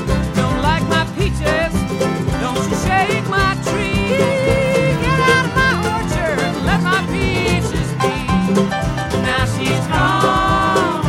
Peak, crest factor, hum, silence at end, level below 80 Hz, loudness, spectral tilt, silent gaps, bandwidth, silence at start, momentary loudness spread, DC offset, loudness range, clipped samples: -2 dBFS; 14 dB; none; 0 s; -28 dBFS; -16 LUFS; -5.5 dB/octave; none; 16.5 kHz; 0 s; 5 LU; under 0.1%; 2 LU; under 0.1%